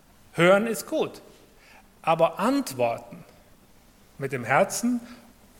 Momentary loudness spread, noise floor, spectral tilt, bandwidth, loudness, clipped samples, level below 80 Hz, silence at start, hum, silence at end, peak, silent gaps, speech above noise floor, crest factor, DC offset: 15 LU; -55 dBFS; -4.5 dB/octave; 17 kHz; -25 LUFS; under 0.1%; -62 dBFS; 0.35 s; none; 0.45 s; -6 dBFS; none; 31 dB; 22 dB; under 0.1%